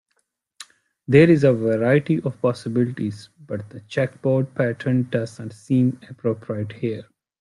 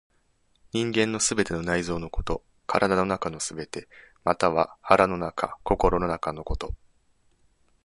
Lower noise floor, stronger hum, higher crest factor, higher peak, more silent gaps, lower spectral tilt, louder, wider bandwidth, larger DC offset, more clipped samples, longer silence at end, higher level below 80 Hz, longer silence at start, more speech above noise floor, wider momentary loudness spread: first, -72 dBFS vs -67 dBFS; neither; about the same, 20 dB vs 24 dB; about the same, -2 dBFS vs -2 dBFS; neither; first, -8 dB/octave vs -4 dB/octave; first, -21 LUFS vs -26 LUFS; about the same, 11.5 kHz vs 11.5 kHz; neither; neither; second, 0.4 s vs 1.1 s; second, -60 dBFS vs -42 dBFS; second, 0.6 s vs 0.75 s; first, 51 dB vs 41 dB; first, 17 LU vs 12 LU